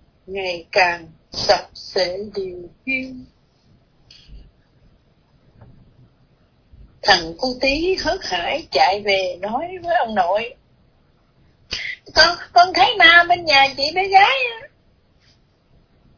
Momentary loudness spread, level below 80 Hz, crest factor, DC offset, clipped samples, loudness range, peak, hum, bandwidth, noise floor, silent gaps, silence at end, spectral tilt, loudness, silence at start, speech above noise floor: 16 LU; -48 dBFS; 20 dB; under 0.1%; under 0.1%; 14 LU; 0 dBFS; none; 5.4 kHz; -57 dBFS; none; 1.5 s; -2.5 dB/octave; -17 LUFS; 0.3 s; 40 dB